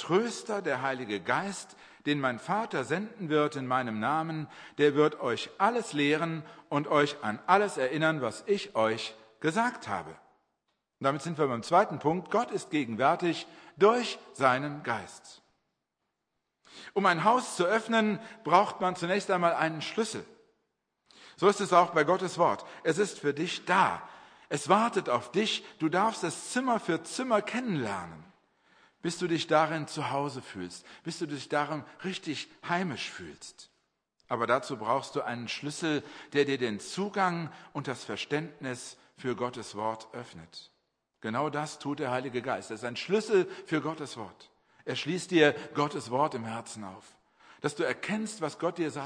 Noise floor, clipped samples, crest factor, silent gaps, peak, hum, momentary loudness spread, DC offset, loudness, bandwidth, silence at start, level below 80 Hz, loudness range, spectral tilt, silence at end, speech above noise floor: -83 dBFS; under 0.1%; 24 dB; none; -8 dBFS; none; 13 LU; under 0.1%; -30 LUFS; 10.5 kHz; 0 s; -76 dBFS; 6 LU; -4.5 dB/octave; 0 s; 54 dB